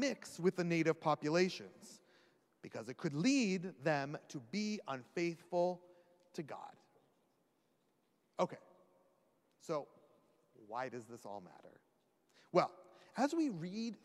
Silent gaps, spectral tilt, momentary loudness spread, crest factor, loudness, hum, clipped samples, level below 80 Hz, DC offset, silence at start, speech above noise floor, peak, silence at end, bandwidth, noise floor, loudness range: none; -5.5 dB/octave; 18 LU; 22 dB; -39 LUFS; none; under 0.1%; under -90 dBFS; under 0.1%; 0 s; 40 dB; -18 dBFS; 0.1 s; 13.5 kHz; -79 dBFS; 11 LU